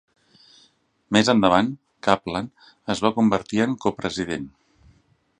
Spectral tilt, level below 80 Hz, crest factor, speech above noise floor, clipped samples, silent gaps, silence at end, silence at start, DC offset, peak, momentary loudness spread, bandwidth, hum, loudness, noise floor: -5 dB/octave; -54 dBFS; 22 dB; 40 dB; under 0.1%; none; 0.9 s; 1.1 s; under 0.1%; 0 dBFS; 14 LU; 10 kHz; none; -22 LUFS; -62 dBFS